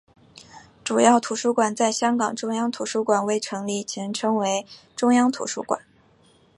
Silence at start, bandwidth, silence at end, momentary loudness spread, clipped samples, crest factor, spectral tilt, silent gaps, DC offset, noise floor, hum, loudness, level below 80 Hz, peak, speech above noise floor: 0.35 s; 11.5 kHz; 0.8 s; 10 LU; under 0.1%; 20 dB; -3.5 dB/octave; none; under 0.1%; -57 dBFS; none; -23 LUFS; -70 dBFS; -4 dBFS; 35 dB